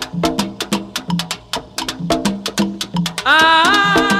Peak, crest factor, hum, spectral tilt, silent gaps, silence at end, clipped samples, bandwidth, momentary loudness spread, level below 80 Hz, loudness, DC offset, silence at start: -2 dBFS; 16 dB; none; -3.5 dB/octave; none; 0 s; under 0.1%; 16 kHz; 13 LU; -44 dBFS; -16 LUFS; under 0.1%; 0 s